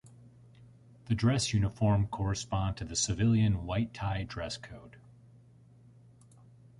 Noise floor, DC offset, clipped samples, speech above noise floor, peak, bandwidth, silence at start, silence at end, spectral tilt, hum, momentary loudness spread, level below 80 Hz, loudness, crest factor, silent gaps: -58 dBFS; under 0.1%; under 0.1%; 28 dB; -16 dBFS; 11 kHz; 0.05 s; 1.9 s; -5 dB/octave; none; 11 LU; -48 dBFS; -31 LUFS; 18 dB; none